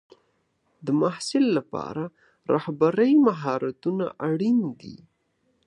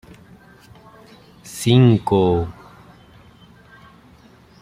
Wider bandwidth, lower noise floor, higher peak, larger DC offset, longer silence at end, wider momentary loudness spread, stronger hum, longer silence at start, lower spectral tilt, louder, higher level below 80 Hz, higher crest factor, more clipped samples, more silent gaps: second, 11 kHz vs 15 kHz; first, -70 dBFS vs -49 dBFS; second, -8 dBFS vs -2 dBFS; neither; second, 0.7 s vs 2.1 s; about the same, 17 LU vs 16 LU; neither; second, 0.85 s vs 1.45 s; about the same, -6.5 dB/octave vs -7 dB/octave; second, -24 LUFS vs -17 LUFS; second, -70 dBFS vs -50 dBFS; about the same, 18 dB vs 20 dB; neither; neither